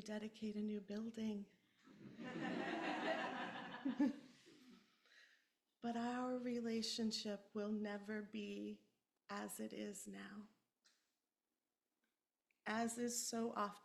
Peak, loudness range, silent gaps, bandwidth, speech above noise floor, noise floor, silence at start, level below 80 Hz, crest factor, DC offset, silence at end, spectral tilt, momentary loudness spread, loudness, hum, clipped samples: -28 dBFS; 8 LU; none; 14 kHz; over 45 dB; under -90 dBFS; 0 s; -88 dBFS; 18 dB; under 0.1%; 0.05 s; -3.5 dB/octave; 15 LU; -46 LUFS; none; under 0.1%